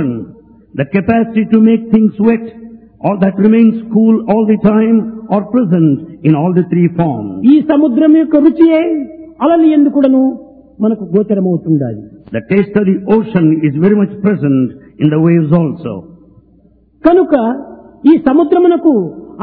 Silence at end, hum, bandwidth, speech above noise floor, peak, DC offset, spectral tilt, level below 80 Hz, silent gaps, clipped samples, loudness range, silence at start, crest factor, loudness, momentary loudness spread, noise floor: 0 s; none; 4.3 kHz; 37 dB; 0 dBFS; under 0.1%; -12.5 dB/octave; -48 dBFS; none; 0.3%; 3 LU; 0 s; 10 dB; -11 LUFS; 11 LU; -47 dBFS